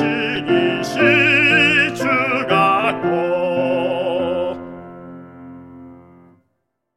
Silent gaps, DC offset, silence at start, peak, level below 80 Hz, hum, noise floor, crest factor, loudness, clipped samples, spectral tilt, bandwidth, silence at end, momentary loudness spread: none; under 0.1%; 0 s; -2 dBFS; -58 dBFS; none; -72 dBFS; 18 dB; -16 LUFS; under 0.1%; -5 dB/octave; 14 kHz; 1 s; 20 LU